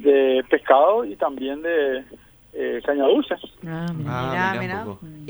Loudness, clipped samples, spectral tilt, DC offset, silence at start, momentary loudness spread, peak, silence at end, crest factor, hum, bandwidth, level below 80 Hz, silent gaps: -22 LUFS; under 0.1%; -7 dB/octave; under 0.1%; 0 s; 14 LU; -2 dBFS; 0 s; 18 dB; none; over 20 kHz; -56 dBFS; none